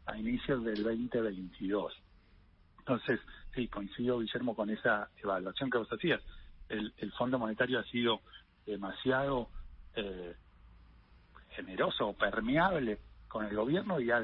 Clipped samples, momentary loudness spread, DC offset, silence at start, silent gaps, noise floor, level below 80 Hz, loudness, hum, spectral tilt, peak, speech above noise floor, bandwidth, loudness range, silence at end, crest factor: under 0.1%; 12 LU; under 0.1%; 0.05 s; none; -63 dBFS; -56 dBFS; -35 LUFS; none; -3.5 dB/octave; -16 dBFS; 29 dB; 5.6 kHz; 4 LU; 0 s; 20 dB